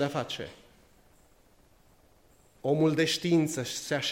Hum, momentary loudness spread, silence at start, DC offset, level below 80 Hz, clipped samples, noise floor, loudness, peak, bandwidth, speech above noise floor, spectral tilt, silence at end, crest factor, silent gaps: none; 12 LU; 0 s; under 0.1%; -66 dBFS; under 0.1%; -61 dBFS; -29 LUFS; -12 dBFS; 16 kHz; 33 dB; -4.5 dB/octave; 0 s; 18 dB; none